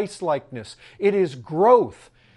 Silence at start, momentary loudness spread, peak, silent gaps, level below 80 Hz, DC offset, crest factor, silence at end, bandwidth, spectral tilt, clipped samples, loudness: 0 s; 21 LU; -4 dBFS; none; -62 dBFS; under 0.1%; 18 dB; 0.45 s; 11.5 kHz; -6.5 dB/octave; under 0.1%; -21 LUFS